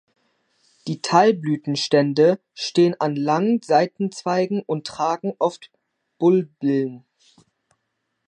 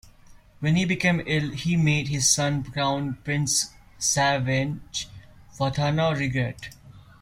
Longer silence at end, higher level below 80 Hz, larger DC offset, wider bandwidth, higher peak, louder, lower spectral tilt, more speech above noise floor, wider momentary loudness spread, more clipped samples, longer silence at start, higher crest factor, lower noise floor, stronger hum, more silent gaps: first, 1.3 s vs 0.2 s; second, -74 dBFS vs -50 dBFS; neither; second, 9.8 kHz vs 15.5 kHz; first, -2 dBFS vs -6 dBFS; first, -21 LUFS vs -24 LUFS; first, -6 dB/octave vs -4 dB/octave; first, 56 dB vs 26 dB; about the same, 10 LU vs 11 LU; neither; first, 0.85 s vs 0.3 s; about the same, 20 dB vs 18 dB; first, -76 dBFS vs -51 dBFS; neither; neither